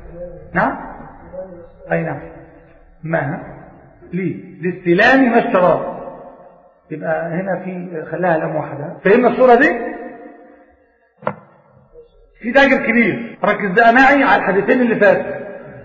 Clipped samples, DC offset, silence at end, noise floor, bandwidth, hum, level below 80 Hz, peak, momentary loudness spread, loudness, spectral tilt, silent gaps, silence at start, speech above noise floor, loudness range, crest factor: under 0.1%; under 0.1%; 0 s; -55 dBFS; 7.4 kHz; none; -48 dBFS; -2 dBFS; 22 LU; -15 LUFS; -7.5 dB/octave; none; 0.05 s; 40 dB; 11 LU; 16 dB